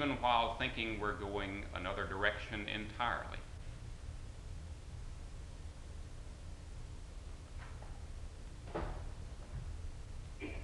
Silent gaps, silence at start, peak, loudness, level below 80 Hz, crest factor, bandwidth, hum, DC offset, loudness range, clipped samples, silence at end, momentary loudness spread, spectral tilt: none; 0 s; -16 dBFS; -42 LUFS; -48 dBFS; 26 dB; 11.5 kHz; none; under 0.1%; 13 LU; under 0.1%; 0 s; 16 LU; -5 dB/octave